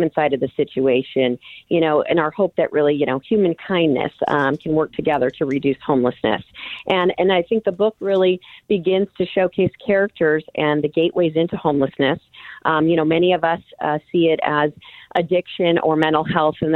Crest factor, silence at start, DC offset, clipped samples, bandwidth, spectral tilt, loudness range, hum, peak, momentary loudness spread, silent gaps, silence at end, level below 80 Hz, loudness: 18 dB; 0 s; under 0.1%; under 0.1%; 4.3 kHz; -8.5 dB/octave; 1 LU; none; -2 dBFS; 5 LU; none; 0 s; -56 dBFS; -19 LUFS